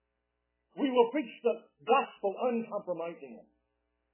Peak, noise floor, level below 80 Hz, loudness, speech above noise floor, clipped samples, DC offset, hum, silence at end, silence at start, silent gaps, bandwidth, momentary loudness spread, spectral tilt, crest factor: -12 dBFS; -82 dBFS; -86 dBFS; -32 LUFS; 50 dB; under 0.1%; under 0.1%; none; 0.7 s; 0.75 s; none; 3.2 kHz; 15 LU; -3 dB/octave; 22 dB